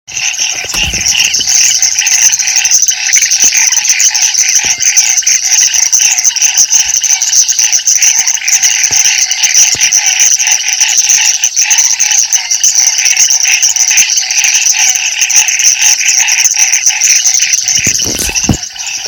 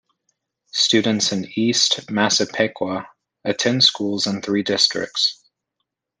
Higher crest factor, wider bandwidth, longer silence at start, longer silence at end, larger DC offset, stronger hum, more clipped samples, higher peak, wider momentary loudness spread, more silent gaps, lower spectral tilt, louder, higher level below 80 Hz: second, 8 dB vs 20 dB; first, over 20 kHz vs 10 kHz; second, 0.1 s vs 0.75 s; second, 0 s vs 0.85 s; neither; neither; first, 4% vs under 0.1%; about the same, 0 dBFS vs -2 dBFS; second, 4 LU vs 11 LU; neither; second, 1.5 dB/octave vs -2.5 dB/octave; first, -5 LUFS vs -18 LUFS; first, -38 dBFS vs -66 dBFS